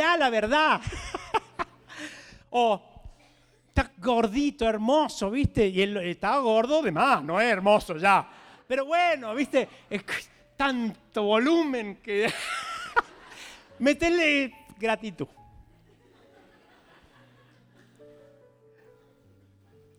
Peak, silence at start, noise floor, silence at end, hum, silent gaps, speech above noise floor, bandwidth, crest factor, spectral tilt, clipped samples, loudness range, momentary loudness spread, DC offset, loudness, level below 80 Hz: -8 dBFS; 0 s; -61 dBFS; 4.35 s; none; none; 36 dB; 16 kHz; 20 dB; -5 dB/octave; under 0.1%; 6 LU; 14 LU; under 0.1%; -26 LUFS; -48 dBFS